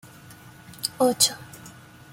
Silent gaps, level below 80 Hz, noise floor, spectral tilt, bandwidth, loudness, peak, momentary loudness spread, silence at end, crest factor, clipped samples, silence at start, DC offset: none; -64 dBFS; -47 dBFS; -2 dB/octave; 16.5 kHz; -22 LUFS; -4 dBFS; 26 LU; 0.45 s; 24 dB; under 0.1%; 0.3 s; under 0.1%